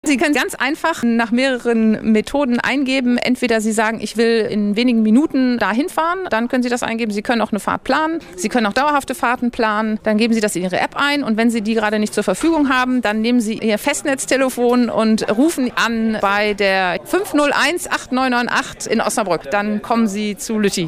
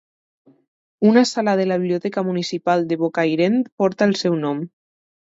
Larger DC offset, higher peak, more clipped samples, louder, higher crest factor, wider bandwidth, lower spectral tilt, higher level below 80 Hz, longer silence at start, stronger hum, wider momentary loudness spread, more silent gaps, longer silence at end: neither; about the same, -2 dBFS vs -2 dBFS; neither; about the same, -17 LUFS vs -19 LUFS; about the same, 14 dB vs 18 dB; first, 16 kHz vs 8 kHz; second, -4 dB/octave vs -6 dB/octave; first, -48 dBFS vs -70 dBFS; second, 0.05 s vs 1 s; neither; second, 4 LU vs 7 LU; second, none vs 3.72-3.78 s; second, 0 s vs 0.65 s